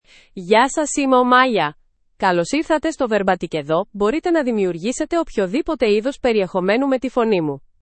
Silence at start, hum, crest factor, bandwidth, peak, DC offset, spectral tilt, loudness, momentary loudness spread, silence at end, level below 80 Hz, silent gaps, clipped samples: 0.35 s; none; 18 dB; 8.8 kHz; 0 dBFS; under 0.1%; -4.5 dB/octave; -18 LUFS; 7 LU; 0.25 s; -48 dBFS; none; under 0.1%